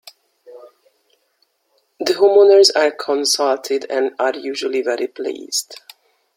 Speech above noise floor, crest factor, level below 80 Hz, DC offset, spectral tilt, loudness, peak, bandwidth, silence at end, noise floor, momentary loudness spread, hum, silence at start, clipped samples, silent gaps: 49 dB; 18 dB; -70 dBFS; under 0.1%; -0.5 dB/octave; -16 LUFS; 0 dBFS; 16.5 kHz; 0.6 s; -65 dBFS; 14 LU; none; 0.5 s; under 0.1%; none